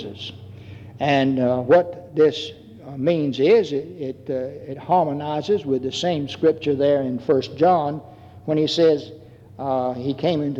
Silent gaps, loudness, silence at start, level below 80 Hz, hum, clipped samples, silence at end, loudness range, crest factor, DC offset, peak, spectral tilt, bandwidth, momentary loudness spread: none; -21 LUFS; 0 s; -62 dBFS; none; under 0.1%; 0 s; 2 LU; 16 dB; under 0.1%; -6 dBFS; -6.5 dB/octave; 8 kHz; 17 LU